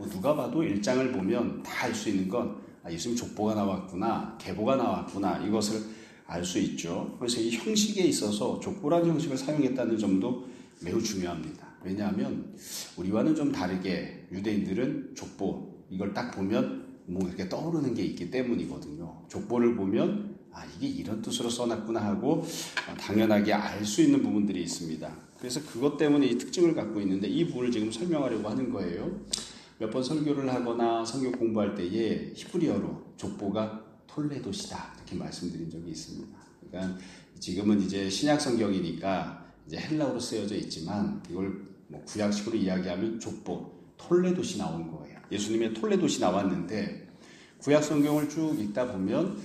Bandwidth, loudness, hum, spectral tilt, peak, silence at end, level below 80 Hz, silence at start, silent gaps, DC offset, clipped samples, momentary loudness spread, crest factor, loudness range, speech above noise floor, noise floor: 15 kHz; -30 LUFS; none; -5.5 dB/octave; -8 dBFS; 0 s; -62 dBFS; 0 s; none; under 0.1%; under 0.1%; 13 LU; 22 dB; 5 LU; 23 dB; -53 dBFS